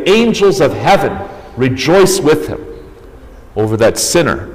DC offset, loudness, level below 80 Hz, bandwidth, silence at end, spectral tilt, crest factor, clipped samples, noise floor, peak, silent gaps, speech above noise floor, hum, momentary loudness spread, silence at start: under 0.1%; -11 LUFS; -36 dBFS; 16 kHz; 0 s; -4.5 dB/octave; 10 dB; under 0.1%; -35 dBFS; -2 dBFS; none; 23 dB; none; 16 LU; 0 s